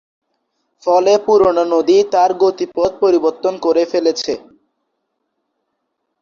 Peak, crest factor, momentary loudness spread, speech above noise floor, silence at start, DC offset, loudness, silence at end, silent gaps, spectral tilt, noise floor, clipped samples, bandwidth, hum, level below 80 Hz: -2 dBFS; 14 dB; 7 LU; 58 dB; 0.85 s; under 0.1%; -14 LUFS; 1.85 s; none; -4.5 dB/octave; -72 dBFS; under 0.1%; 7.2 kHz; none; -54 dBFS